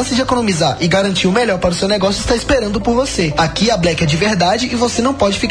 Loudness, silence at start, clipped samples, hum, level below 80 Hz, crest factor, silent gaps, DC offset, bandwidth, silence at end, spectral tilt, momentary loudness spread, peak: -14 LUFS; 0 s; under 0.1%; none; -32 dBFS; 14 dB; none; under 0.1%; 10.5 kHz; 0 s; -4.5 dB/octave; 2 LU; -2 dBFS